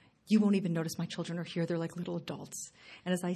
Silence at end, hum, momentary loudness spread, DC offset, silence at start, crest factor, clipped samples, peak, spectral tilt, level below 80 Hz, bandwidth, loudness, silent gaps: 0 s; none; 15 LU; under 0.1%; 0.25 s; 18 dB; under 0.1%; -16 dBFS; -6 dB/octave; -74 dBFS; 13.5 kHz; -34 LUFS; none